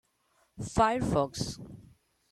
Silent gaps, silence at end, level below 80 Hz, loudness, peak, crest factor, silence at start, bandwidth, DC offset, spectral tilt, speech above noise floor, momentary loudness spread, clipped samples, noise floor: none; 0.5 s; -50 dBFS; -30 LUFS; -12 dBFS; 20 dB; 0.55 s; 13.5 kHz; under 0.1%; -5.5 dB/octave; 42 dB; 18 LU; under 0.1%; -71 dBFS